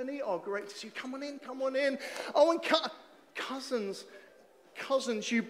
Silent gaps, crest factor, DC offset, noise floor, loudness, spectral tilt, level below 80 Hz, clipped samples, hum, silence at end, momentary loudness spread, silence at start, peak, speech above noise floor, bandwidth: none; 24 dB; under 0.1%; -60 dBFS; -33 LUFS; -3 dB/octave; -90 dBFS; under 0.1%; none; 0 s; 17 LU; 0 s; -10 dBFS; 27 dB; 15 kHz